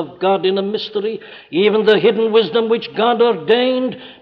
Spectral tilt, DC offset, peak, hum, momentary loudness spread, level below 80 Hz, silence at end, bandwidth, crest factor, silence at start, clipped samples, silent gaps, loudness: -7.5 dB/octave; under 0.1%; -2 dBFS; none; 10 LU; -66 dBFS; 0.1 s; 5.8 kHz; 14 dB; 0 s; under 0.1%; none; -16 LUFS